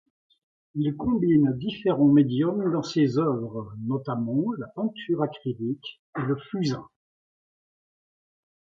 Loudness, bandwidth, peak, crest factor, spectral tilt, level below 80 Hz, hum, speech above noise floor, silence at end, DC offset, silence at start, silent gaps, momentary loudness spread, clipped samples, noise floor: -26 LUFS; 7.4 kHz; -8 dBFS; 18 dB; -8 dB/octave; -60 dBFS; none; over 65 dB; 1.95 s; under 0.1%; 0.75 s; 5.99-6.13 s; 12 LU; under 0.1%; under -90 dBFS